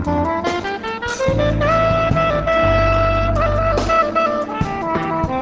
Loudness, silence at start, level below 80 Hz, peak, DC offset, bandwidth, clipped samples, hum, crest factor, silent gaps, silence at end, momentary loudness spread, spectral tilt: -17 LUFS; 0 s; -28 dBFS; -4 dBFS; under 0.1%; 8 kHz; under 0.1%; none; 12 dB; none; 0 s; 7 LU; -6.5 dB/octave